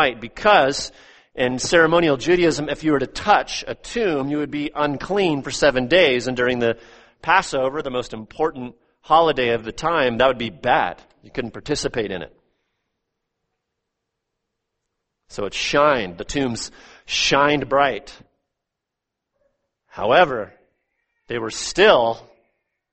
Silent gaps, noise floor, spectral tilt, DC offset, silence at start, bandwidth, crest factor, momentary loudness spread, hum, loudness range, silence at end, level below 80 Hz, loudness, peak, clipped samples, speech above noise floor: none; -83 dBFS; -4 dB/octave; under 0.1%; 0 s; 8.8 kHz; 20 dB; 15 LU; none; 7 LU; 0.7 s; -46 dBFS; -20 LUFS; 0 dBFS; under 0.1%; 63 dB